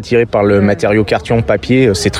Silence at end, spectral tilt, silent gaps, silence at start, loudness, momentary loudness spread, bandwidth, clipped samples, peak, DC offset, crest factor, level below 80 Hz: 0 s; -6 dB/octave; none; 0 s; -12 LUFS; 3 LU; 13.5 kHz; under 0.1%; 0 dBFS; under 0.1%; 10 dB; -34 dBFS